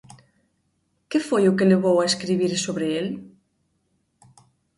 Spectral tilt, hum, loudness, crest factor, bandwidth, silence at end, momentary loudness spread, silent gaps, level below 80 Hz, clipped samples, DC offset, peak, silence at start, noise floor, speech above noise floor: -5 dB/octave; none; -21 LUFS; 18 dB; 11.5 kHz; 1.5 s; 10 LU; none; -64 dBFS; under 0.1%; under 0.1%; -6 dBFS; 1.1 s; -70 dBFS; 50 dB